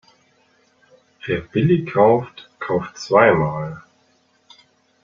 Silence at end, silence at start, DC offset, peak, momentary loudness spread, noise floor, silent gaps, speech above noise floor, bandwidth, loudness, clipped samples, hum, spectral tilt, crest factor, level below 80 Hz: 1.25 s; 1.25 s; under 0.1%; -2 dBFS; 19 LU; -61 dBFS; none; 43 dB; 7.4 kHz; -18 LUFS; under 0.1%; none; -7 dB/octave; 20 dB; -52 dBFS